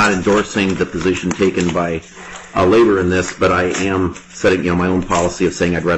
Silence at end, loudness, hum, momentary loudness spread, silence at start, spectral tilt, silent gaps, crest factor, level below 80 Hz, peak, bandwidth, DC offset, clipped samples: 0 s; -16 LUFS; none; 8 LU; 0 s; -5.5 dB/octave; none; 12 dB; -40 dBFS; -4 dBFS; 9.6 kHz; under 0.1%; under 0.1%